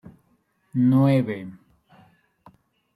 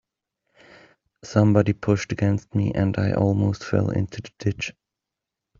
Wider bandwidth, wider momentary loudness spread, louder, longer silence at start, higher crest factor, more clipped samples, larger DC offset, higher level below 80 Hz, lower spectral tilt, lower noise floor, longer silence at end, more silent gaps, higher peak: first, 11.5 kHz vs 7.4 kHz; first, 17 LU vs 10 LU; about the same, -21 LUFS vs -23 LUFS; second, 0.05 s vs 1.25 s; about the same, 16 dB vs 20 dB; neither; neither; second, -64 dBFS vs -52 dBFS; first, -9.5 dB/octave vs -7.5 dB/octave; second, -66 dBFS vs -86 dBFS; first, 1.45 s vs 0.9 s; neither; second, -8 dBFS vs -4 dBFS